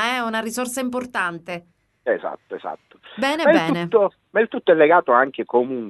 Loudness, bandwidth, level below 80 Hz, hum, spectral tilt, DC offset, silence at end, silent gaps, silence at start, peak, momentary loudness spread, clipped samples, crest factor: -20 LUFS; 12 kHz; -66 dBFS; none; -4.5 dB/octave; under 0.1%; 0 s; none; 0 s; -2 dBFS; 17 LU; under 0.1%; 20 dB